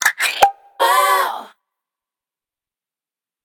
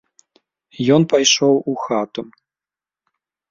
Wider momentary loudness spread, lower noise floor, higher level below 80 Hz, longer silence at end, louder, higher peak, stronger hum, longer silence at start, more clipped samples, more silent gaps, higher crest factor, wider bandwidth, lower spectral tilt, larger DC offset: second, 8 LU vs 12 LU; about the same, under -90 dBFS vs under -90 dBFS; about the same, -62 dBFS vs -62 dBFS; first, 1.95 s vs 1.25 s; about the same, -16 LUFS vs -16 LUFS; about the same, 0 dBFS vs -2 dBFS; neither; second, 0 s vs 0.8 s; neither; neither; about the same, 20 dB vs 18 dB; first, 19.5 kHz vs 7.6 kHz; second, 1 dB/octave vs -4 dB/octave; neither